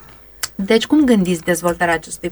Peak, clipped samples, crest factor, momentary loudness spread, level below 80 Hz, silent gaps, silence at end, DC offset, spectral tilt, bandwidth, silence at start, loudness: -2 dBFS; under 0.1%; 16 dB; 12 LU; -46 dBFS; none; 0 s; under 0.1%; -4.5 dB/octave; over 20 kHz; 0.4 s; -16 LUFS